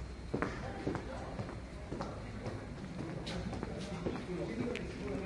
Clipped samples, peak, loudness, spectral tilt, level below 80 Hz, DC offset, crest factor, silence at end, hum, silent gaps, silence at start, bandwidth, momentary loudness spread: under 0.1%; -16 dBFS; -41 LUFS; -6.5 dB/octave; -50 dBFS; under 0.1%; 24 dB; 0 s; none; none; 0 s; 11.5 kHz; 5 LU